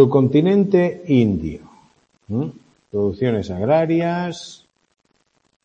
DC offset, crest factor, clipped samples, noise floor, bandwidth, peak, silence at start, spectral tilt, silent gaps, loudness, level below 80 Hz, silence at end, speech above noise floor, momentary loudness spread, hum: under 0.1%; 18 dB; under 0.1%; -65 dBFS; 8.6 kHz; 0 dBFS; 0 s; -8 dB/octave; none; -19 LUFS; -50 dBFS; 1.1 s; 48 dB; 15 LU; none